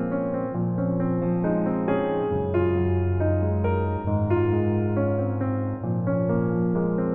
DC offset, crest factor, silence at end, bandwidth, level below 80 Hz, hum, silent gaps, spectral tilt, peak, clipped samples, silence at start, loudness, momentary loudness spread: under 0.1%; 14 dB; 0 s; 3.6 kHz; -48 dBFS; none; none; -13 dB/octave; -10 dBFS; under 0.1%; 0 s; -24 LUFS; 4 LU